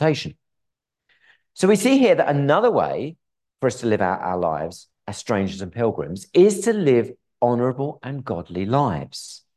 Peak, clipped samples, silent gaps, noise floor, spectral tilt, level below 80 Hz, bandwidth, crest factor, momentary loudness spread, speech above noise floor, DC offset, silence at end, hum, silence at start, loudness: -4 dBFS; under 0.1%; none; -81 dBFS; -6 dB/octave; -52 dBFS; 12.5 kHz; 18 dB; 16 LU; 60 dB; under 0.1%; 0.2 s; none; 0 s; -21 LUFS